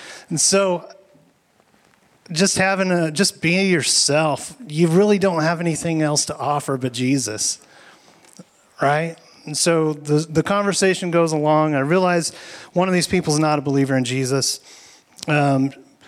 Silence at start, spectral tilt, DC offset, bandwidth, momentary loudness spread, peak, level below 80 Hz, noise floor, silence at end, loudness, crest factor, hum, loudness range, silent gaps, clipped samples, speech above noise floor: 0 s; -4 dB/octave; under 0.1%; 15 kHz; 10 LU; -6 dBFS; -58 dBFS; -59 dBFS; 0.25 s; -19 LUFS; 14 dB; none; 5 LU; none; under 0.1%; 40 dB